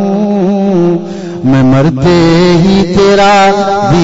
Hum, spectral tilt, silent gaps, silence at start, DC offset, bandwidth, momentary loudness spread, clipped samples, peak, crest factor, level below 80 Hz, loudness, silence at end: none; -6.5 dB/octave; none; 0 s; under 0.1%; 8 kHz; 6 LU; under 0.1%; 0 dBFS; 6 dB; -30 dBFS; -8 LUFS; 0 s